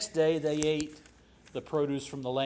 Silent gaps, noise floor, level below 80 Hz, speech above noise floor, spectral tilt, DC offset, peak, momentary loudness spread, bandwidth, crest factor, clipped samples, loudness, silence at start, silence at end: none; -58 dBFS; -60 dBFS; 28 dB; -5 dB/octave; under 0.1%; -14 dBFS; 13 LU; 8 kHz; 18 dB; under 0.1%; -31 LUFS; 0 s; 0 s